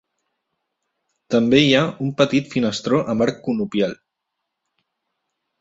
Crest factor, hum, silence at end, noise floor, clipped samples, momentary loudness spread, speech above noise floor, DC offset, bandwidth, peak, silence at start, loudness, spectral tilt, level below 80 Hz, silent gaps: 20 dB; none; 1.65 s; -79 dBFS; under 0.1%; 9 LU; 61 dB; under 0.1%; 7.8 kHz; -2 dBFS; 1.3 s; -19 LUFS; -5.5 dB/octave; -58 dBFS; none